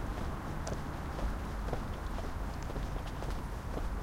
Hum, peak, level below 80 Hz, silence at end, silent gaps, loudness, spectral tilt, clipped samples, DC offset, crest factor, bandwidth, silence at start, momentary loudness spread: none; -20 dBFS; -40 dBFS; 0 s; none; -40 LUFS; -6 dB/octave; under 0.1%; under 0.1%; 18 dB; 16.5 kHz; 0 s; 2 LU